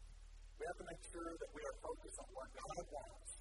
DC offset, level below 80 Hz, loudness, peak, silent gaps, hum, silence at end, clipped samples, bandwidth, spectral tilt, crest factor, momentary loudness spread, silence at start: under 0.1%; -60 dBFS; -51 LUFS; -34 dBFS; none; none; 0 s; under 0.1%; 11.5 kHz; -4 dB/octave; 18 dB; 5 LU; 0 s